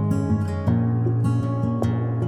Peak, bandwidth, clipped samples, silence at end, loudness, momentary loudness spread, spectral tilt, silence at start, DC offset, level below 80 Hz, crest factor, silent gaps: -8 dBFS; 9 kHz; under 0.1%; 0 s; -23 LUFS; 2 LU; -9.5 dB/octave; 0 s; under 0.1%; -46 dBFS; 12 dB; none